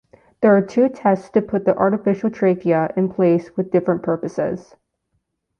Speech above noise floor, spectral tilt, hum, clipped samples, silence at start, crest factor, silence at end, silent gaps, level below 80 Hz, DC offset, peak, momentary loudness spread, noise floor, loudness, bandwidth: 54 dB; -9 dB/octave; none; under 0.1%; 0.4 s; 16 dB; 1 s; none; -60 dBFS; under 0.1%; -2 dBFS; 7 LU; -72 dBFS; -19 LUFS; 7 kHz